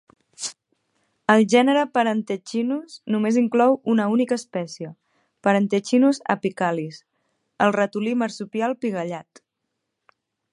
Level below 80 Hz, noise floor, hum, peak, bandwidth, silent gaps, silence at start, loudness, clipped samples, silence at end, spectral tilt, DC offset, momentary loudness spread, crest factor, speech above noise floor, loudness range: -74 dBFS; -79 dBFS; none; -2 dBFS; 11 kHz; none; 0.4 s; -22 LUFS; under 0.1%; 1.3 s; -5.5 dB/octave; under 0.1%; 14 LU; 20 dB; 58 dB; 5 LU